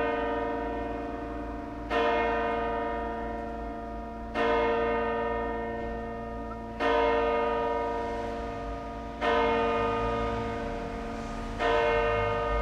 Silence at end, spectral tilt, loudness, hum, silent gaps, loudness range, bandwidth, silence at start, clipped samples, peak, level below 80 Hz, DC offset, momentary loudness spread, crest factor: 0 s; -6 dB/octave; -30 LUFS; none; none; 2 LU; 9.6 kHz; 0 s; under 0.1%; -14 dBFS; -42 dBFS; under 0.1%; 11 LU; 16 dB